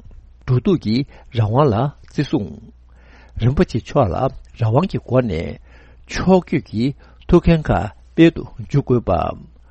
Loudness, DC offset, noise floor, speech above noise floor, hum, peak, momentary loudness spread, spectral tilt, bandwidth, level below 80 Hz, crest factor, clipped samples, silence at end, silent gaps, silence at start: -18 LUFS; under 0.1%; -45 dBFS; 27 dB; none; -2 dBFS; 13 LU; -8 dB/octave; 8.4 kHz; -34 dBFS; 18 dB; under 0.1%; 0.25 s; none; 0.45 s